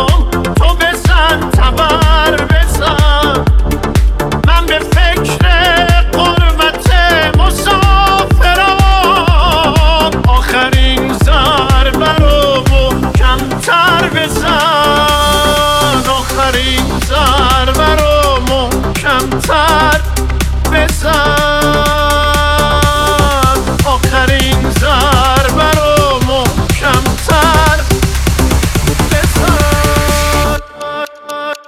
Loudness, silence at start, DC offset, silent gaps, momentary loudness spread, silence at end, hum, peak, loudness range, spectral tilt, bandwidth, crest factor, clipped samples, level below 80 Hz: -10 LUFS; 0 s; under 0.1%; none; 4 LU; 0.1 s; none; 0 dBFS; 2 LU; -4.5 dB/octave; 16 kHz; 10 dB; under 0.1%; -14 dBFS